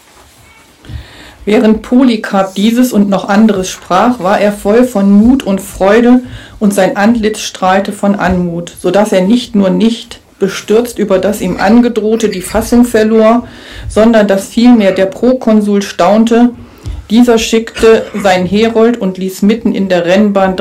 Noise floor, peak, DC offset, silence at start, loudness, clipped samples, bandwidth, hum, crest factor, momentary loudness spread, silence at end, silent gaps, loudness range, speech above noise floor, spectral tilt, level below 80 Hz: -41 dBFS; 0 dBFS; under 0.1%; 0.85 s; -9 LUFS; 0.8%; 15.5 kHz; none; 10 dB; 9 LU; 0 s; none; 3 LU; 32 dB; -5.5 dB/octave; -34 dBFS